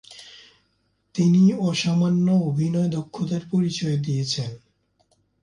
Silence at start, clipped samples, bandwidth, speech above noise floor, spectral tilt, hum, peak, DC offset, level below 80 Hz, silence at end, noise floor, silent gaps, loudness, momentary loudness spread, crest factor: 0.1 s; under 0.1%; 10.5 kHz; 48 dB; -6.5 dB/octave; none; -8 dBFS; under 0.1%; -60 dBFS; 0.85 s; -69 dBFS; none; -22 LUFS; 12 LU; 14 dB